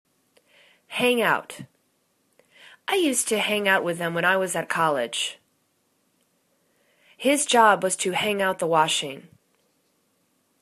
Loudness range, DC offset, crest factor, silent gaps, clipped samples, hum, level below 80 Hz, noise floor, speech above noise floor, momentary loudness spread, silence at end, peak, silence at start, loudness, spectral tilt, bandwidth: 4 LU; under 0.1%; 22 dB; none; under 0.1%; none; -74 dBFS; -69 dBFS; 47 dB; 11 LU; 1.35 s; -4 dBFS; 0.9 s; -22 LUFS; -2.5 dB/octave; 14 kHz